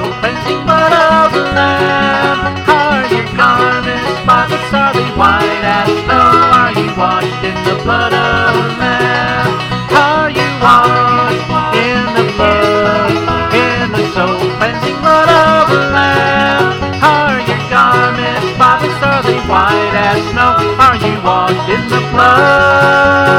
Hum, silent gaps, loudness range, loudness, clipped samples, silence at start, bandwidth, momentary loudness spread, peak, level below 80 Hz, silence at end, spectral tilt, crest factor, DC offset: none; none; 2 LU; -10 LUFS; 0.5%; 0 s; 17.5 kHz; 7 LU; 0 dBFS; -34 dBFS; 0 s; -5.5 dB/octave; 10 dB; under 0.1%